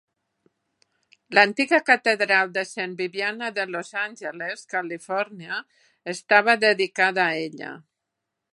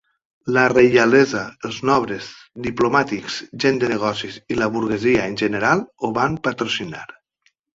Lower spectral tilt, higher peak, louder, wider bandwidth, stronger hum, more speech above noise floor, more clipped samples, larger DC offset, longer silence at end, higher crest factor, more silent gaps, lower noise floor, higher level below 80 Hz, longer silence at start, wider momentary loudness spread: second, -3.5 dB/octave vs -5 dB/octave; about the same, -2 dBFS vs -2 dBFS; second, -22 LUFS vs -19 LUFS; first, 11.5 kHz vs 7.8 kHz; neither; first, 59 dB vs 46 dB; neither; neither; about the same, 0.75 s vs 0.7 s; first, 24 dB vs 18 dB; neither; first, -82 dBFS vs -65 dBFS; second, -80 dBFS vs -52 dBFS; first, 1.3 s vs 0.45 s; about the same, 14 LU vs 15 LU